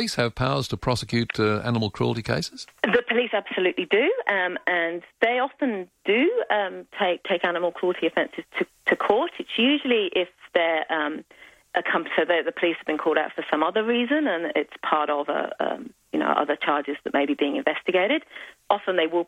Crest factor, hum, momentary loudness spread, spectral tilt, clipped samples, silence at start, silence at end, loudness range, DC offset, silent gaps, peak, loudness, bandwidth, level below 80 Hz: 18 dB; none; 6 LU; -5.5 dB/octave; under 0.1%; 0 s; 0.05 s; 1 LU; under 0.1%; none; -6 dBFS; -24 LUFS; 13.5 kHz; -56 dBFS